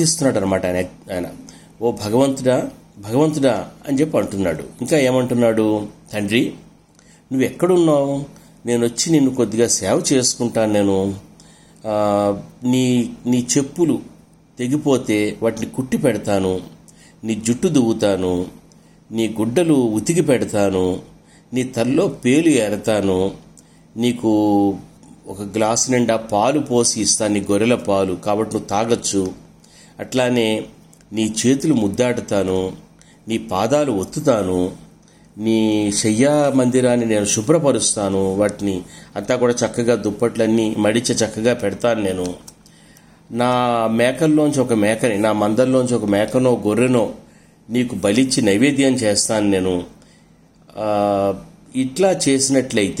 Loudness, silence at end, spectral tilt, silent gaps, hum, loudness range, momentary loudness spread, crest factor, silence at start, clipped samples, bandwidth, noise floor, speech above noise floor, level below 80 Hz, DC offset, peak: -18 LUFS; 0 s; -4.5 dB/octave; none; none; 3 LU; 10 LU; 16 dB; 0 s; under 0.1%; 16 kHz; -50 dBFS; 33 dB; -52 dBFS; under 0.1%; -2 dBFS